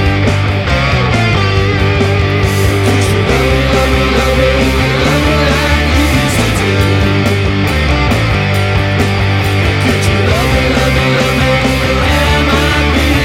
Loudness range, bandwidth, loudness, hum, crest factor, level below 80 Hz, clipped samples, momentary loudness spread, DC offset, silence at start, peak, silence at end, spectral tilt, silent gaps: 1 LU; 16.5 kHz; -11 LUFS; none; 10 dB; -18 dBFS; under 0.1%; 2 LU; under 0.1%; 0 s; 0 dBFS; 0 s; -5.5 dB/octave; none